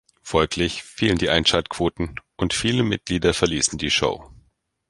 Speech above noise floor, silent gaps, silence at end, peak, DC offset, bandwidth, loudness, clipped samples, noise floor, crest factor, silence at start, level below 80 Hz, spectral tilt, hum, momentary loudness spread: 42 dB; none; 0.55 s; -2 dBFS; under 0.1%; 11.5 kHz; -21 LUFS; under 0.1%; -64 dBFS; 22 dB; 0.25 s; -40 dBFS; -3.5 dB/octave; none; 7 LU